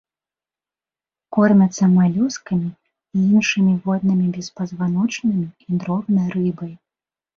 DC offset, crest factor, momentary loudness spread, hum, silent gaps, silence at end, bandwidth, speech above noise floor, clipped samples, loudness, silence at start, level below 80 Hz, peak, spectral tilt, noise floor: under 0.1%; 16 dB; 11 LU; none; none; 0.6 s; 7.4 kHz; over 72 dB; under 0.1%; -19 LUFS; 1.3 s; -60 dBFS; -4 dBFS; -6.5 dB/octave; under -90 dBFS